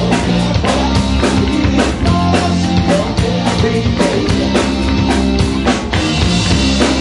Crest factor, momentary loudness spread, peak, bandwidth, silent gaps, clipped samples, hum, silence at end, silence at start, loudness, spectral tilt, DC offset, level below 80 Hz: 12 dB; 2 LU; 0 dBFS; 11 kHz; none; under 0.1%; none; 0 s; 0 s; -13 LUFS; -5.5 dB/octave; under 0.1%; -22 dBFS